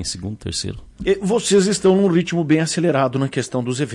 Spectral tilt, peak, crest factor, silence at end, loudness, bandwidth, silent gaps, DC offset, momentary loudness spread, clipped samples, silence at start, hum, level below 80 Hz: -5 dB/octave; -6 dBFS; 14 dB; 0 s; -19 LUFS; 11.5 kHz; none; under 0.1%; 11 LU; under 0.1%; 0 s; none; -46 dBFS